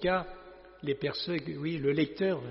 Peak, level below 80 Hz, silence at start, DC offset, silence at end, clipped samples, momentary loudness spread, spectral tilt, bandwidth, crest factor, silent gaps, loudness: -16 dBFS; -56 dBFS; 0 s; under 0.1%; 0 s; under 0.1%; 15 LU; -4.5 dB/octave; 5.8 kHz; 16 dB; none; -32 LUFS